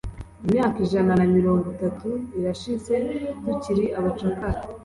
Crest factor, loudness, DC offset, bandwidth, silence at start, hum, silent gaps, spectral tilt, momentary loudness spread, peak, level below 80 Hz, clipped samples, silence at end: 14 dB; -24 LUFS; under 0.1%; 11.5 kHz; 0.05 s; none; none; -8 dB/octave; 10 LU; -8 dBFS; -42 dBFS; under 0.1%; 0 s